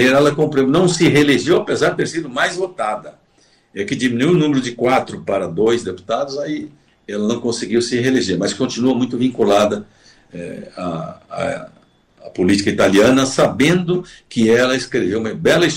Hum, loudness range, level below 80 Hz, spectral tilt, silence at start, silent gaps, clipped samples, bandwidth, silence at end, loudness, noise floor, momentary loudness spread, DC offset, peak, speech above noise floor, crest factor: none; 5 LU; -52 dBFS; -5 dB/octave; 0 s; none; under 0.1%; 16 kHz; 0 s; -17 LUFS; -55 dBFS; 14 LU; under 0.1%; -4 dBFS; 39 dB; 12 dB